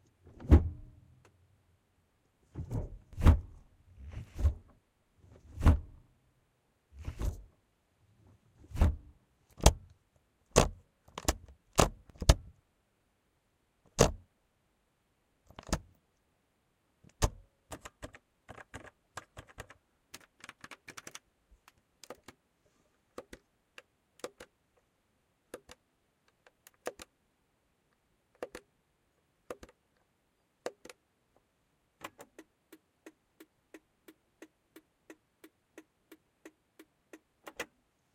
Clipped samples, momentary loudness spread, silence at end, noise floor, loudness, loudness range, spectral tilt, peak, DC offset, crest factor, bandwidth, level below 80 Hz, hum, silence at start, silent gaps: under 0.1%; 26 LU; 0.5 s; -76 dBFS; -32 LUFS; 21 LU; -5 dB/octave; -2 dBFS; under 0.1%; 34 dB; 16 kHz; -42 dBFS; none; 0.45 s; none